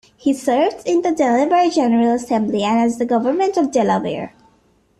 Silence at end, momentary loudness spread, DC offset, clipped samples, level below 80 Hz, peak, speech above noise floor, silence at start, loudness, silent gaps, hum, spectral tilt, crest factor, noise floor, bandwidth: 0.7 s; 5 LU; under 0.1%; under 0.1%; -58 dBFS; -4 dBFS; 41 dB; 0.25 s; -17 LUFS; none; none; -5.5 dB/octave; 14 dB; -57 dBFS; 13 kHz